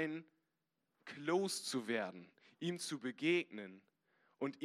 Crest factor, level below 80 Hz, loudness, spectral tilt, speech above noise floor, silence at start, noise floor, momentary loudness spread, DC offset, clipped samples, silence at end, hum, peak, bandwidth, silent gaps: 20 dB; under -90 dBFS; -40 LUFS; -4 dB/octave; 47 dB; 0 s; -87 dBFS; 18 LU; under 0.1%; under 0.1%; 0 s; none; -22 dBFS; 14.5 kHz; none